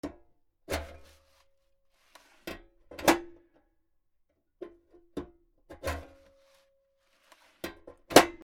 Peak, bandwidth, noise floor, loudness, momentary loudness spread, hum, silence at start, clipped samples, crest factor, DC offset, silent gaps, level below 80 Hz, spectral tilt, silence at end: 0 dBFS; 17.5 kHz; -73 dBFS; -28 LUFS; 27 LU; none; 0.05 s; under 0.1%; 34 dB; under 0.1%; none; -56 dBFS; -3 dB/octave; 0.1 s